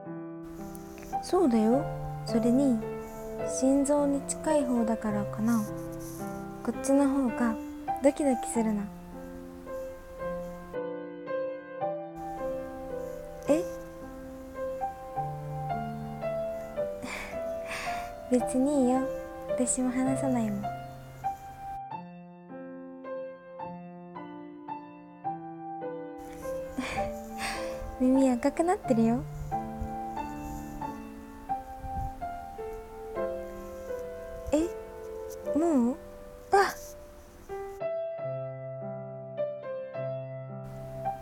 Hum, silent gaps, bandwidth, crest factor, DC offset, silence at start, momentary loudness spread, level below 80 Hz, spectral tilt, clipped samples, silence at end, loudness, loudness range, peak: none; none; 17.5 kHz; 20 dB; under 0.1%; 0 s; 17 LU; -50 dBFS; -5.5 dB/octave; under 0.1%; 0 s; -31 LUFS; 10 LU; -10 dBFS